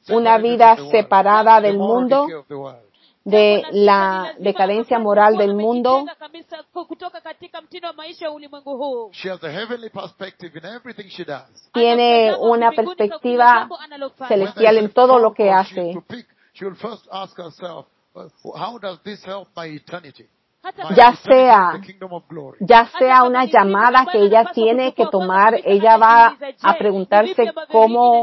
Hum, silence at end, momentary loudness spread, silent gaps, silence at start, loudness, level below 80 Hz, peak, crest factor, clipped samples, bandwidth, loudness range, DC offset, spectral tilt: none; 0 s; 23 LU; none; 0.1 s; -14 LUFS; -60 dBFS; 0 dBFS; 16 dB; under 0.1%; 6 kHz; 17 LU; under 0.1%; -6.5 dB/octave